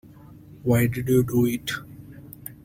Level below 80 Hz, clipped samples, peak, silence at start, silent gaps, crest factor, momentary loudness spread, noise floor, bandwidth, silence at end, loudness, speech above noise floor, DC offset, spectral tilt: -50 dBFS; under 0.1%; -8 dBFS; 0.3 s; none; 18 dB; 22 LU; -46 dBFS; 16.5 kHz; 0.1 s; -23 LUFS; 25 dB; under 0.1%; -6.5 dB/octave